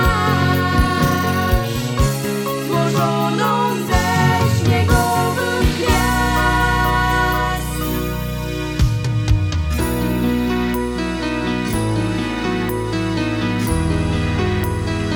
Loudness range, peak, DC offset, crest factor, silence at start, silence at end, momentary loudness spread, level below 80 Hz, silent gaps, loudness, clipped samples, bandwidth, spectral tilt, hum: 4 LU; -2 dBFS; under 0.1%; 16 dB; 0 s; 0 s; 6 LU; -26 dBFS; none; -18 LUFS; under 0.1%; 19.5 kHz; -5.5 dB/octave; none